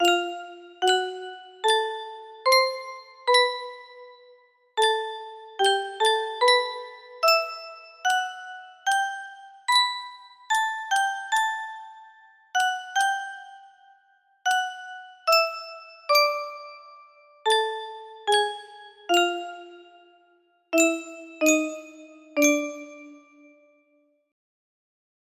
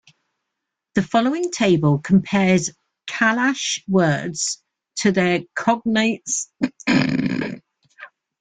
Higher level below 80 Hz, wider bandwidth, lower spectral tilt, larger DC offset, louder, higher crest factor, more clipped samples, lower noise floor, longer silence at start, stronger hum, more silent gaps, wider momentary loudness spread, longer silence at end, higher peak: second, -78 dBFS vs -56 dBFS; first, 16 kHz vs 9.4 kHz; second, 0.5 dB/octave vs -4.5 dB/octave; neither; second, -24 LUFS vs -20 LUFS; about the same, 20 dB vs 16 dB; neither; second, -66 dBFS vs -81 dBFS; second, 0 s vs 0.95 s; neither; neither; first, 20 LU vs 9 LU; first, 2.1 s vs 0.35 s; about the same, -6 dBFS vs -4 dBFS